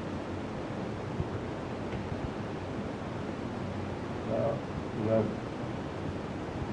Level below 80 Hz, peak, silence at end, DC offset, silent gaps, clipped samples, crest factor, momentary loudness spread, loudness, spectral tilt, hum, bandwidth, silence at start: -52 dBFS; -16 dBFS; 0 s; under 0.1%; none; under 0.1%; 18 dB; 7 LU; -35 LUFS; -7.5 dB/octave; none; 11 kHz; 0 s